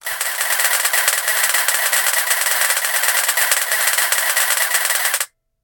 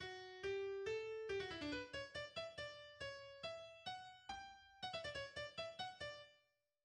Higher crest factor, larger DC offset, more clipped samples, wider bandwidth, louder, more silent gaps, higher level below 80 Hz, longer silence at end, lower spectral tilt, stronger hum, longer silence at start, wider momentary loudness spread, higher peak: about the same, 18 dB vs 16 dB; neither; neither; first, 18 kHz vs 10.5 kHz; first, -15 LUFS vs -49 LUFS; neither; first, -66 dBFS vs -72 dBFS; about the same, 0.4 s vs 0.45 s; second, 5 dB/octave vs -3.5 dB/octave; neither; about the same, 0.05 s vs 0 s; second, 3 LU vs 8 LU; first, 0 dBFS vs -34 dBFS